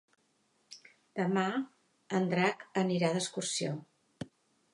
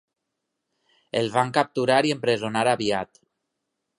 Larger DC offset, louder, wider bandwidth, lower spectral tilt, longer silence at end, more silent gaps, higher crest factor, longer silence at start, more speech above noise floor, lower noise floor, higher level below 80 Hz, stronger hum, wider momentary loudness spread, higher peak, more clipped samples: neither; second, -33 LUFS vs -23 LUFS; about the same, 11.5 kHz vs 11.5 kHz; about the same, -4.5 dB/octave vs -4.5 dB/octave; second, 0.5 s vs 0.95 s; neither; about the same, 20 dB vs 22 dB; second, 0.7 s vs 1.15 s; second, 42 dB vs 58 dB; second, -74 dBFS vs -81 dBFS; second, -76 dBFS vs -66 dBFS; neither; first, 20 LU vs 8 LU; second, -14 dBFS vs -4 dBFS; neither